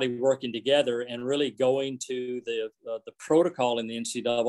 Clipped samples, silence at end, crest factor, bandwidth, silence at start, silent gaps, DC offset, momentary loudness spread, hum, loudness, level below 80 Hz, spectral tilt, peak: under 0.1%; 0 s; 18 dB; 12 kHz; 0 s; none; under 0.1%; 9 LU; none; -27 LUFS; -76 dBFS; -4 dB/octave; -10 dBFS